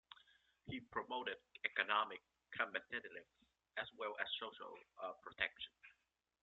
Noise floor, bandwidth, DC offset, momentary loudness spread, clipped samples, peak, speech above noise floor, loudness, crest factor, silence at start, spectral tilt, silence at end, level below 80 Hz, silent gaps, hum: -85 dBFS; 7.6 kHz; under 0.1%; 17 LU; under 0.1%; -20 dBFS; 39 dB; -44 LUFS; 28 dB; 0.1 s; 0.5 dB/octave; 0.5 s; -80 dBFS; none; none